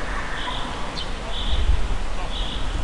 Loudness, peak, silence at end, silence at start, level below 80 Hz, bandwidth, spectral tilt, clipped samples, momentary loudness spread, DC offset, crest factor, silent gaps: -28 LUFS; -8 dBFS; 0 s; 0 s; -26 dBFS; 11 kHz; -4.5 dB/octave; under 0.1%; 5 LU; under 0.1%; 14 dB; none